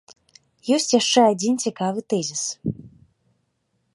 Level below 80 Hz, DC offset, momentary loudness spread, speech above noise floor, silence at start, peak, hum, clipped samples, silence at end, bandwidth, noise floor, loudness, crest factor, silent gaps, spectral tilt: -62 dBFS; under 0.1%; 14 LU; 50 dB; 0.65 s; -4 dBFS; none; under 0.1%; 1.05 s; 11.5 kHz; -71 dBFS; -21 LUFS; 20 dB; none; -3.5 dB/octave